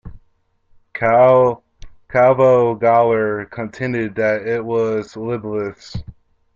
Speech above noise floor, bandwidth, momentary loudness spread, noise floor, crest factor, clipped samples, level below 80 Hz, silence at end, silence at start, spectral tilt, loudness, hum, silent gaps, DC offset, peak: 44 dB; 7.4 kHz; 16 LU; -60 dBFS; 16 dB; under 0.1%; -46 dBFS; 0.45 s; 0.05 s; -8 dB/octave; -16 LUFS; none; none; under 0.1%; -2 dBFS